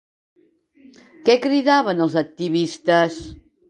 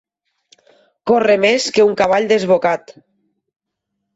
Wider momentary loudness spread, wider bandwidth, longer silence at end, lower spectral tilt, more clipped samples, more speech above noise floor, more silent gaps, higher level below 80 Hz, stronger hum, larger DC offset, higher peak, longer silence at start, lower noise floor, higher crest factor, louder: about the same, 7 LU vs 7 LU; first, 10.5 kHz vs 8 kHz; second, 0.35 s vs 1.25 s; first, -5.5 dB/octave vs -4 dB/octave; neither; second, 35 dB vs 62 dB; neither; about the same, -54 dBFS vs -58 dBFS; neither; neither; about the same, -2 dBFS vs -2 dBFS; first, 1.25 s vs 1.05 s; second, -54 dBFS vs -76 dBFS; about the same, 18 dB vs 14 dB; second, -19 LUFS vs -14 LUFS